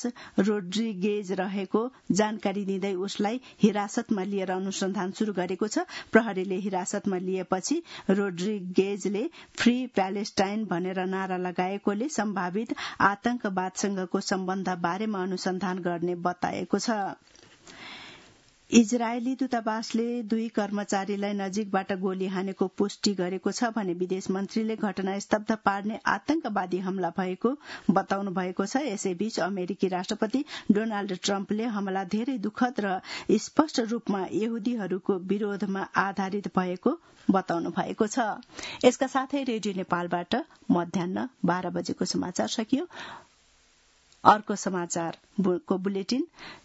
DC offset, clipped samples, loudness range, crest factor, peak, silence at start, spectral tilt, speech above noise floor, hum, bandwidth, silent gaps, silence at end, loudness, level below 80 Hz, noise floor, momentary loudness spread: under 0.1%; under 0.1%; 2 LU; 26 dB; -2 dBFS; 0 s; -5 dB/octave; 35 dB; none; 8 kHz; none; 0.05 s; -28 LUFS; -68 dBFS; -62 dBFS; 6 LU